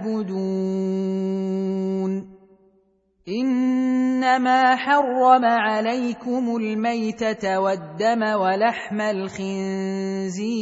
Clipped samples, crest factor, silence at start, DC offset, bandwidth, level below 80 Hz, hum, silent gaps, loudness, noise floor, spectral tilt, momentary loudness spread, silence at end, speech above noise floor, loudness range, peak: under 0.1%; 18 dB; 0 s; under 0.1%; 8 kHz; -64 dBFS; none; none; -22 LUFS; -63 dBFS; -6 dB/octave; 9 LU; 0 s; 42 dB; 6 LU; -2 dBFS